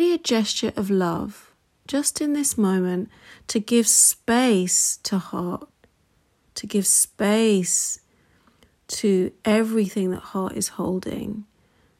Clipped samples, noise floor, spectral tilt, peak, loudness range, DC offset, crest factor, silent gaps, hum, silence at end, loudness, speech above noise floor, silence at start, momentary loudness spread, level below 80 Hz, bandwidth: under 0.1%; -64 dBFS; -3.5 dB/octave; -4 dBFS; 5 LU; under 0.1%; 18 dB; none; none; 0.55 s; -21 LUFS; 42 dB; 0 s; 15 LU; -60 dBFS; 16 kHz